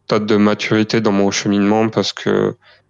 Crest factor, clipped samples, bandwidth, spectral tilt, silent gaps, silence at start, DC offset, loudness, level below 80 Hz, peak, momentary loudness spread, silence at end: 12 dB; under 0.1%; 7.6 kHz; -5 dB/octave; none; 0.1 s; under 0.1%; -16 LUFS; -58 dBFS; -4 dBFS; 4 LU; 0.35 s